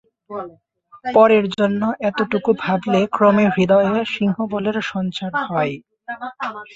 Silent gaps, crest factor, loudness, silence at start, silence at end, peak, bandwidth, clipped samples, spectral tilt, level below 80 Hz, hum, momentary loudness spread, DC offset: none; 18 dB; -18 LUFS; 0.3 s; 0.1 s; -2 dBFS; 7.8 kHz; under 0.1%; -7 dB/octave; -58 dBFS; none; 17 LU; under 0.1%